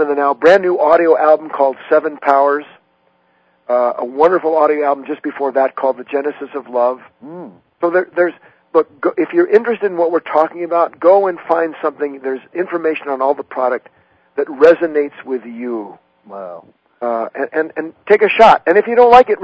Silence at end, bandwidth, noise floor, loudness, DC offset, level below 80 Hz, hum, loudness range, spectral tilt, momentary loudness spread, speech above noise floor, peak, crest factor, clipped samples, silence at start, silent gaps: 0 s; 8 kHz; -58 dBFS; -14 LUFS; under 0.1%; -56 dBFS; none; 5 LU; -6 dB/octave; 14 LU; 44 dB; 0 dBFS; 14 dB; 0.4%; 0 s; none